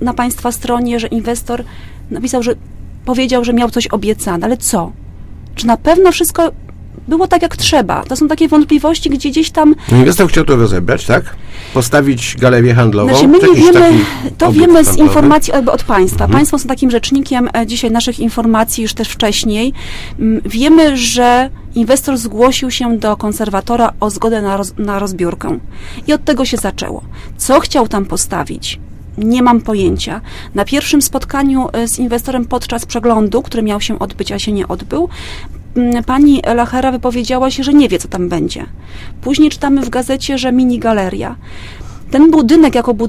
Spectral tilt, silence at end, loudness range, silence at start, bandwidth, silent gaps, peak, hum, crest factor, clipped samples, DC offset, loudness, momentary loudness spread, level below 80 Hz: -5 dB/octave; 0 s; 7 LU; 0 s; 16 kHz; none; 0 dBFS; none; 12 dB; 0.2%; under 0.1%; -12 LUFS; 13 LU; -30 dBFS